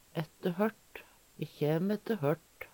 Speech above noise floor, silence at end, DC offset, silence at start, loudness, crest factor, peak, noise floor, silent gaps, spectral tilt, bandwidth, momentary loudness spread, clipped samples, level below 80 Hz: 21 dB; 0.05 s; under 0.1%; 0.15 s; -34 LUFS; 20 dB; -16 dBFS; -54 dBFS; none; -7.5 dB/octave; 19 kHz; 18 LU; under 0.1%; -72 dBFS